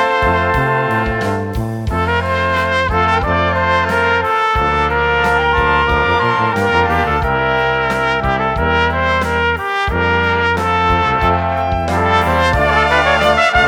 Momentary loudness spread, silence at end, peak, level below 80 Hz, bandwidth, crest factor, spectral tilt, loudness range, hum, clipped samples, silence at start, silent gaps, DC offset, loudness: 4 LU; 0 s; 0 dBFS; -28 dBFS; 18 kHz; 14 dB; -5.5 dB/octave; 2 LU; none; under 0.1%; 0 s; none; under 0.1%; -14 LUFS